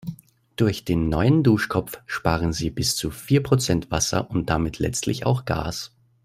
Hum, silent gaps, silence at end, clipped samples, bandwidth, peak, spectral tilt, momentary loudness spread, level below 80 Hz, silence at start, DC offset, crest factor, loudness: none; none; 0.4 s; under 0.1%; 16 kHz; -4 dBFS; -5 dB/octave; 9 LU; -42 dBFS; 0.05 s; under 0.1%; 20 dB; -23 LUFS